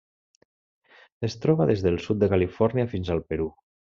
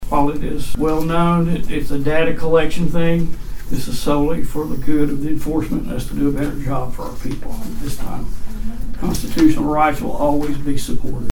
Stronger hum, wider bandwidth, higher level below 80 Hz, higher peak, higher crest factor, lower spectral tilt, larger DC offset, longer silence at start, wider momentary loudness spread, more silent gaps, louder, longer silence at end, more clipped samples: neither; second, 7.4 kHz vs 17 kHz; second, -52 dBFS vs -26 dBFS; second, -8 dBFS vs 0 dBFS; about the same, 18 dB vs 14 dB; about the same, -7.5 dB/octave vs -6.5 dB/octave; neither; first, 1.2 s vs 0 s; about the same, 10 LU vs 12 LU; neither; second, -25 LUFS vs -20 LUFS; first, 0.4 s vs 0 s; neither